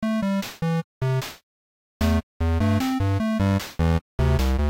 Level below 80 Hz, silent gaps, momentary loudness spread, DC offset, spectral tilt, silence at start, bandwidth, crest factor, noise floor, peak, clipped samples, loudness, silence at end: -30 dBFS; 0.84-1.01 s, 1.43-2.00 s, 2.23-2.40 s, 4.01-4.18 s; 4 LU; under 0.1%; -7 dB/octave; 0 s; 16.5 kHz; 10 dB; under -90 dBFS; -14 dBFS; under 0.1%; -24 LUFS; 0 s